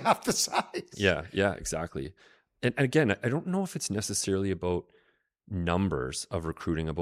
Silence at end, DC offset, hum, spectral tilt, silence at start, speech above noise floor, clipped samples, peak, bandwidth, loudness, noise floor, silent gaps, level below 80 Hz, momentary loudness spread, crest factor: 0 s; under 0.1%; none; -4.5 dB/octave; 0 s; 40 dB; under 0.1%; -10 dBFS; 16 kHz; -30 LUFS; -70 dBFS; none; -54 dBFS; 9 LU; 20 dB